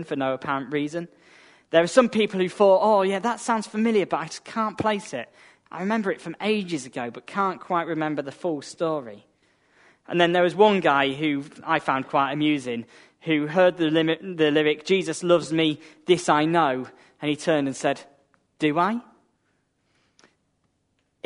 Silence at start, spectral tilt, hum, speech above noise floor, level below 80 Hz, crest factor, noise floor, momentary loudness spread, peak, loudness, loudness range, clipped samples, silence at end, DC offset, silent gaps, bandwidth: 0 s; -5 dB/octave; none; 48 dB; -70 dBFS; 22 dB; -71 dBFS; 13 LU; -2 dBFS; -23 LUFS; 6 LU; under 0.1%; 2.25 s; under 0.1%; none; 11 kHz